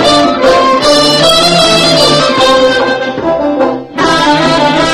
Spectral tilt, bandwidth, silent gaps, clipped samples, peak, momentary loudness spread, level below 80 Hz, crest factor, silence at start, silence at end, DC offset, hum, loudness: -3.5 dB/octave; 16 kHz; none; 0.8%; 0 dBFS; 7 LU; -36 dBFS; 8 dB; 0 s; 0 s; 1%; none; -7 LUFS